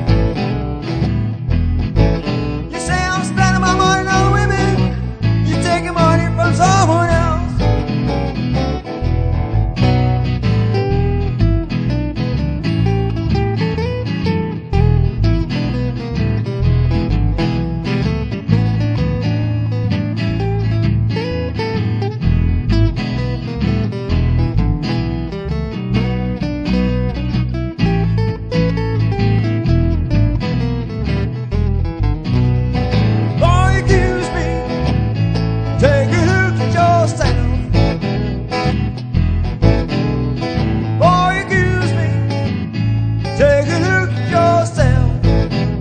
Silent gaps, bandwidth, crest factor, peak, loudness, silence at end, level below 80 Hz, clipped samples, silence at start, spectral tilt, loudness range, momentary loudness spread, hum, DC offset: none; 9.4 kHz; 14 dB; 0 dBFS; -16 LUFS; 0 s; -24 dBFS; under 0.1%; 0 s; -7 dB/octave; 3 LU; 7 LU; none; under 0.1%